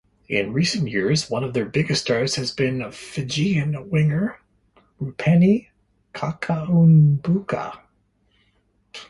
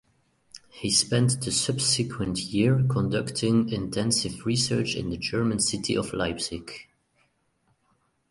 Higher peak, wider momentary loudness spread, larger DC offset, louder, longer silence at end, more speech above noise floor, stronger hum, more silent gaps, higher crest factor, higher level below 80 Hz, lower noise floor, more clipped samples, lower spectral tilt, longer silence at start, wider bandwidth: about the same, -6 dBFS vs -8 dBFS; first, 14 LU vs 9 LU; neither; first, -21 LUFS vs -25 LUFS; second, 0.05 s vs 1.45 s; about the same, 44 dB vs 44 dB; neither; neither; about the same, 16 dB vs 18 dB; about the same, -54 dBFS vs -52 dBFS; second, -64 dBFS vs -70 dBFS; neither; first, -6 dB/octave vs -4 dB/octave; second, 0.3 s vs 0.55 s; about the same, 11.5 kHz vs 11.5 kHz